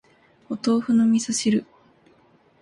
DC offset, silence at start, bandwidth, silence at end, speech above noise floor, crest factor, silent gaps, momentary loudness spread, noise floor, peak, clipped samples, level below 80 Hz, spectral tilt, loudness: under 0.1%; 0.5 s; 11.5 kHz; 1 s; 38 dB; 14 dB; none; 8 LU; -58 dBFS; -10 dBFS; under 0.1%; -66 dBFS; -4.5 dB/octave; -22 LUFS